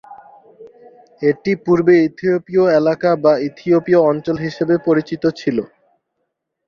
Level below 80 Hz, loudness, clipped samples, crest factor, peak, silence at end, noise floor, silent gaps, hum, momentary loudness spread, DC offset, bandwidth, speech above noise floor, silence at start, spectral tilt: -58 dBFS; -16 LUFS; under 0.1%; 16 dB; -2 dBFS; 1 s; -73 dBFS; none; none; 8 LU; under 0.1%; 6.8 kHz; 58 dB; 0.1 s; -8 dB/octave